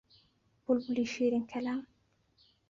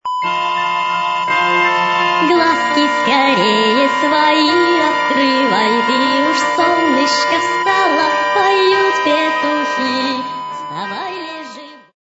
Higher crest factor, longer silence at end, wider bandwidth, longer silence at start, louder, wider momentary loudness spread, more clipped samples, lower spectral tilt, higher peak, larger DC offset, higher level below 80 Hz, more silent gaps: about the same, 18 dB vs 14 dB; first, 0.85 s vs 0.3 s; about the same, 7.4 kHz vs 8 kHz; first, 0.7 s vs 0.05 s; second, -33 LUFS vs -14 LUFS; second, 8 LU vs 11 LU; neither; first, -5 dB/octave vs -3 dB/octave; second, -18 dBFS vs 0 dBFS; neither; second, -72 dBFS vs -64 dBFS; neither